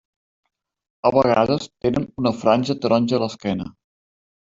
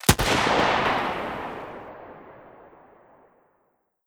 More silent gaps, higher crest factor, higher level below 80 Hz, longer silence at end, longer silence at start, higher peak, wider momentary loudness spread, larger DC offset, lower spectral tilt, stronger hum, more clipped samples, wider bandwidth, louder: neither; about the same, 20 dB vs 24 dB; second, -54 dBFS vs -42 dBFS; second, 0.75 s vs 1.6 s; first, 1.05 s vs 0.05 s; about the same, -2 dBFS vs -2 dBFS; second, 9 LU vs 23 LU; neither; first, -6.5 dB/octave vs -3.5 dB/octave; neither; neither; second, 7.8 kHz vs over 20 kHz; first, -20 LUFS vs -23 LUFS